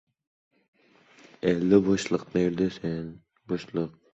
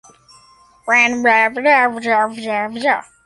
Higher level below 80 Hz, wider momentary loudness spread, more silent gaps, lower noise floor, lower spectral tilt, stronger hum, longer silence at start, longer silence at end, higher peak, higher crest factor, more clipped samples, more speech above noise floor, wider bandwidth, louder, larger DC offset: about the same, -58 dBFS vs -62 dBFS; first, 13 LU vs 8 LU; neither; first, -58 dBFS vs -49 dBFS; first, -6.5 dB/octave vs -3 dB/octave; neither; first, 1.45 s vs 0.85 s; about the same, 0.25 s vs 0.25 s; second, -6 dBFS vs -2 dBFS; first, 22 dB vs 16 dB; neither; about the same, 32 dB vs 34 dB; second, 8.2 kHz vs 11.5 kHz; second, -27 LUFS vs -15 LUFS; neither